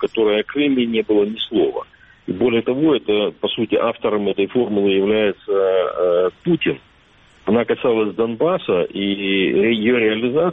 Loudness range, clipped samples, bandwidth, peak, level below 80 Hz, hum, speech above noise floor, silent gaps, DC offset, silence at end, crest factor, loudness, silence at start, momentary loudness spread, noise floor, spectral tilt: 1 LU; under 0.1%; 4 kHz; -4 dBFS; -56 dBFS; none; 34 dB; none; under 0.1%; 0 s; 14 dB; -18 LUFS; 0 s; 5 LU; -51 dBFS; -8.5 dB/octave